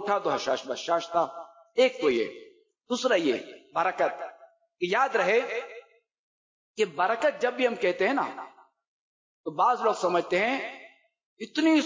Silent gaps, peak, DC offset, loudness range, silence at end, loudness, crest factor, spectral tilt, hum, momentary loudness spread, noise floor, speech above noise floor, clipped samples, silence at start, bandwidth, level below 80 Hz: 6.19-6.74 s, 8.88-9.44 s, 11.25-11.37 s; -12 dBFS; under 0.1%; 2 LU; 0 s; -27 LUFS; 16 dB; -4 dB/octave; none; 17 LU; -50 dBFS; 24 dB; under 0.1%; 0 s; 7.6 kHz; -76 dBFS